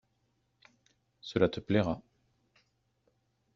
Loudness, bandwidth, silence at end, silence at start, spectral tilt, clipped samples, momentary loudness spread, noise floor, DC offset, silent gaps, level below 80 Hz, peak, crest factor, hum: -32 LUFS; 7.6 kHz; 1.55 s; 1.25 s; -6 dB/octave; under 0.1%; 12 LU; -76 dBFS; under 0.1%; none; -64 dBFS; -12 dBFS; 24 dB; none